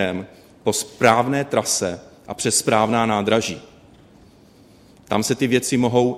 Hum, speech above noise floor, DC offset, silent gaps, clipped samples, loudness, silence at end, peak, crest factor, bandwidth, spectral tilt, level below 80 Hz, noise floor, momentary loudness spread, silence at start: none; 30 dB; under 0.1%; none; under 0.1%; -20 LUFS; 0 s; 0 dBFS; 22 dB; 16 kHz; -4 dB/octave; -56 dBFS; -50 dBFS; 13 LU; 0 s